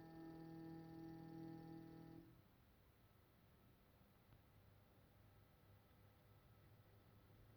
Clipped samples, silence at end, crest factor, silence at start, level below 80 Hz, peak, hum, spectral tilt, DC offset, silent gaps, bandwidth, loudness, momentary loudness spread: under 0.1%; 0 s; 18 dB; 0 s; -80 dBFS; -46 dBFS; none; -7.5 dB/octave; under 0.1%; none; over 20 kHz; -59 LUFS; 6 LU